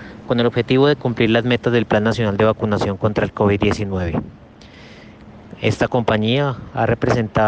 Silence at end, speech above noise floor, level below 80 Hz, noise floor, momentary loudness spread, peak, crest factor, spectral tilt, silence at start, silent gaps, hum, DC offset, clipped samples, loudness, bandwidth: 0 s; 24 dB; -42 dBFS; -42 dBFS; 7 LU; -4 dBFS; 14 dB; -7 dB/octave; 0 s; none; none; under 0.1%; under 0.1%; -18 LUFS; 8.8 kHz